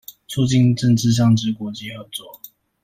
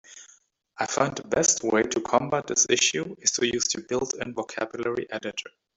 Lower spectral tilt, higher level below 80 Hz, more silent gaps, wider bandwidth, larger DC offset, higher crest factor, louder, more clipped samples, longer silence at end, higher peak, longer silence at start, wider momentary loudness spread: first, -6 dB/octave vs -2 dB/octave; first, -50 dBFS vs -62 dBFS; neither; first, 15.5 kHz vs 8.4 kHz; neither; second, 14 dB vs 22 dB; first, -18 LUFS vs -25 LUFS; neither; first, 0.5 s vs 0.3 s; about the same, -6 dBFS vs -6 dBFS; first, 0.3 s vs 0.1 s; first, 16 LU vs 11 LU